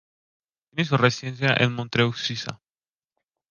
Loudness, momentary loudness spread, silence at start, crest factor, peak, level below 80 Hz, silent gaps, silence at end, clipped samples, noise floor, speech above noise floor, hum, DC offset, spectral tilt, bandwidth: -23 LUFS; 12 LU; 0.75 s; 24 dB; -2 dBFS; -60 dBFS; none; 0.95 s; under 0.1%; under -90 dBFS; over 67 dB; none; under 0.1%; -5.5 dB/octave; 7.2 kHz